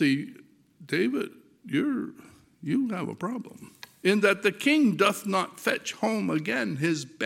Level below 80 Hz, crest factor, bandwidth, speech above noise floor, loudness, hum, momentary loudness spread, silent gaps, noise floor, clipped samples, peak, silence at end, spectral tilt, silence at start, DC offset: -76 dBFS; 20 dB; 16.5 kHz; 26 dB; -27 LUFS; none; 16 LU; none; -53 dBFS; under 0.1%; -8 dBFS; 0 s; -5 dB/octave; 0 s; under 0.1%